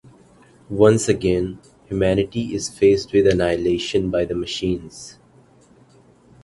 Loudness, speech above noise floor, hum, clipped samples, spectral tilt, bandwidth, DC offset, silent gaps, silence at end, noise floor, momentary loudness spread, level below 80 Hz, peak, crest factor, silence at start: -20 LUFS; 33 dB; none; under 0.1%; -5.5 dB/octave; 11.5 kHz; under 0.1%; none; 1.3 s; -52 dBFS; 14 LU; -42 dBFS; 0 dBFS; 20 dB; 0.7 s